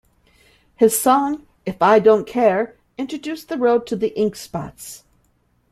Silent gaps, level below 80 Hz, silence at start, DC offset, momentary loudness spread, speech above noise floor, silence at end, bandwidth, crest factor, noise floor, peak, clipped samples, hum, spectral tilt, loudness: none; -56 dBFS; 0.8 s; under 0.1%; 17 LU; 44 dB; 0.75 s; 15.5 kHz; 18 dB; -62 dBFS; -2 dBFS; under 0.1%; 60 Hz at -50 dBFS; -4.5 dB/octave; -19 LUFS